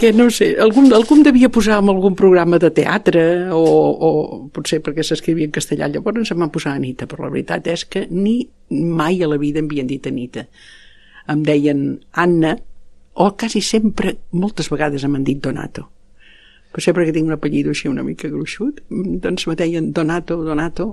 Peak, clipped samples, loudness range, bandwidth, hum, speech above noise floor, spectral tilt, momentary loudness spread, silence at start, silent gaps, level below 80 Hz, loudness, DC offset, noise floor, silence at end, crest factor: 0 dBFS; under 0.1%; 8 LU; 13 kHz; none; 30 dB; -6 dB/octave; 12 LU; 0 s; none; -40 dBFS; -16 LUFS; under 0.1%; -46 dBFS; 0 s; 16 dB